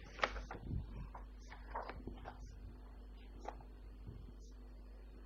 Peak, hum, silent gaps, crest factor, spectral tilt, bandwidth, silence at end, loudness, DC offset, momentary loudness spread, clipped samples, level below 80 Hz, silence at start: -18 dBFS; none; none; 30 dB; -5.5 dB/octave; 7.4 kHz; 0 s; -50 LUFS; under 0.1%; 14 LU; under 0.1%; -52 dBFS; 0 s